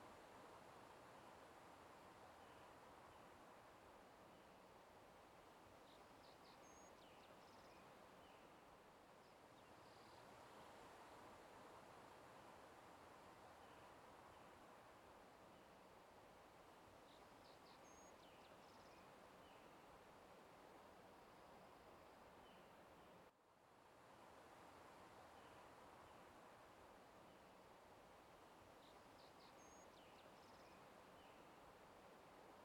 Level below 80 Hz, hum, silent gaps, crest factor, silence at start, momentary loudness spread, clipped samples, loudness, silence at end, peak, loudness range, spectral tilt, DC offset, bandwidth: -84 dBFS; none; none; 14 dB; 0 s; 3 LU; under 0.1%; -65 LUFS; 0 s; -52 dBFS; 2 LU; -4 dB/octave; under 0.1%; 17 kHz